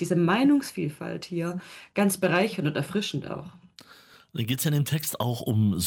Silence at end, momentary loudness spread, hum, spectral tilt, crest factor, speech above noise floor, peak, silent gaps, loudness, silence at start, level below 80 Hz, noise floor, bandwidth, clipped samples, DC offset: 0 s; 14 LU; none; -5.5 dB/octave; 18 dB; 28 dB; -10 dBFS; none; -26 LUFS; 0 s; -62 dBFS; -54 dBFS; 17.5 kHz; under 0.1%; under 0.1%